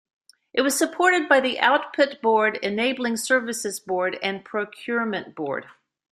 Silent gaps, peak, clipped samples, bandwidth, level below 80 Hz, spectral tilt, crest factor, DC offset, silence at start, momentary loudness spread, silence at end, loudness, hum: none; -2 dBFS; under 0.1%; 15.5 kHz; -70 dBFS; -2.5 dB/octave; 22 dB; under 0.1%; 0.55 s; 10 LU; 0.4 s; -23 LUFS; none